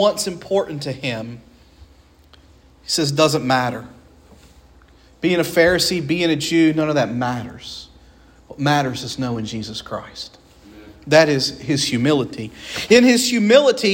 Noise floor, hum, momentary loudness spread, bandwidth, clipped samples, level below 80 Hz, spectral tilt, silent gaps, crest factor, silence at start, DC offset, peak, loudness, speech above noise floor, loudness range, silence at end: -50 dBFS; none; 19 LU; 16.5 kHz; under 0.1%; -50 dBFS; -4.5 dB/octave; none; 20 dB; 0 s; under 0.1%; 0 dBFS; -18 LUFS; 32 dB; 7 LU; 0 s